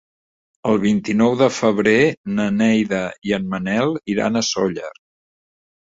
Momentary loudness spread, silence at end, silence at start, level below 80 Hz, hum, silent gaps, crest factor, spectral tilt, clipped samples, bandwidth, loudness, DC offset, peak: 8 LU; 0.95 s; 0.65 s; -54 dBFS; none; 2.17-2.24 s, 3.18-3.22 s; 18 dB; -5 dB/octave; under 0.1%; 8 kHz; -19 LUFS; under 0.1%; -2 dBFS